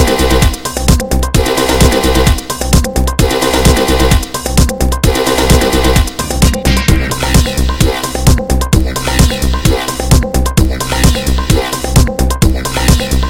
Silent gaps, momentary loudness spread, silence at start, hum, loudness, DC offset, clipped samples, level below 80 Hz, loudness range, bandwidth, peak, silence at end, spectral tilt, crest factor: none; 4 LU; 0 s; none; -12 LUFS; 3%; 0.3%; -14 dBFS; 1 LU; 17 kHz; 0 dBFS; 0 s; -4.5 dB/octave; 10 dB